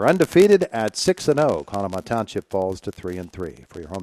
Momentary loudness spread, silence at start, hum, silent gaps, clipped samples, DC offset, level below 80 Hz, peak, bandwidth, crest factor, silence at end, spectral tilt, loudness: 18 LU; 0 s; none; none; under 0.1%; under 0.1%; -52 dBFS; -4 dBFS; 14.5 kHz; 18 dB; 0 s; -5.5 dB/octave; -21 LUFS